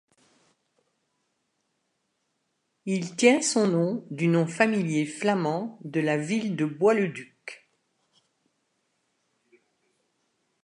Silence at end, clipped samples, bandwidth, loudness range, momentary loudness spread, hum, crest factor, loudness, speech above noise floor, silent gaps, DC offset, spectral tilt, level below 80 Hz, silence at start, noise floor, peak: 3.1 s; under 0.1%; 11 kHz; 6 LU; 12 LU; none; 24 dB; -25 LUFS; 52 dB; none; under 0.1%; -5 dB/octave; -80 dBFS; 2.85 s; -76 dBFS; -6 dBFS